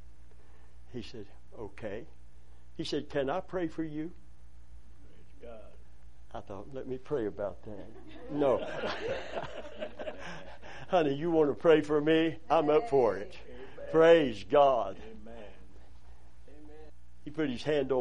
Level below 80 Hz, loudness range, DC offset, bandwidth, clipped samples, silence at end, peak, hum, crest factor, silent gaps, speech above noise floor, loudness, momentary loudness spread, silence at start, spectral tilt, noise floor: -56 dBFS; 14 LU; 0.9%; 10 kHz; under 0.1%; 0 s; -10 dBFS; 60 Hz at -60 dBFS; 22 dB; none; 27 dB; -30 LUFS; 24 LU; 0.05 s; -6.5 dB/octave; -57 dBFS